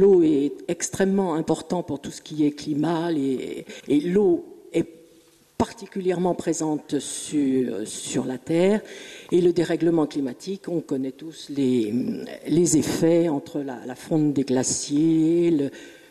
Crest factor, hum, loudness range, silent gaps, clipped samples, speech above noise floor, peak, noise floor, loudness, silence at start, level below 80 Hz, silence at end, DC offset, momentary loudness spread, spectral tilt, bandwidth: 16 dB; none; 3 LU; none; under 0.1%; 33 dB; -8 dBFS; -56 dBFS; -24 LUFS; 0 s; -58 dBFS; 0.2 s; under 0.1%; 12 LU; -5.5 dB/octave; 13.5 kHz